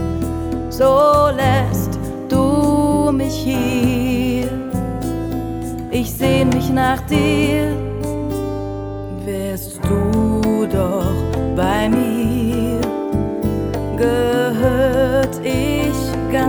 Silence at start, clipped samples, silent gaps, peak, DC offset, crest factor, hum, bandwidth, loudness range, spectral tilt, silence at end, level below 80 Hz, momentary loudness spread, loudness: 0 s; under 0.1%; none; -2 dBFS; under 0.1%; 16 dB; none; over 20 kHz; 4 LU; -6.5 dB/octave; 0 s; -32 dBFS; 8 LU; -18 LUFS